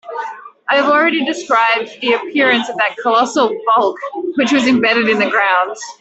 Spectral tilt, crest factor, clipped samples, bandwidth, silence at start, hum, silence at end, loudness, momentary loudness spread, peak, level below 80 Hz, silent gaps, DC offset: -3.5 dB/octave; 12 dB; under 0.1%; 8.2 kHz; 0.05 s; none; 0.1 s; -14 LUFS; 9 LU; -2 dBFS; -62 dBFS; none; under 0.1%